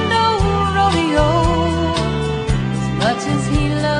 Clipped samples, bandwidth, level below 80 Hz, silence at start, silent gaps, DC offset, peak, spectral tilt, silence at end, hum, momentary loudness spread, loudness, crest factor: under 0.1%; 10 kHz; -26 dBFS; 0 s; none; under 0.1%; -2 dBFS; -6 dB/octave; 0 s; none; 5 LU; -17 LUFS; 14 dB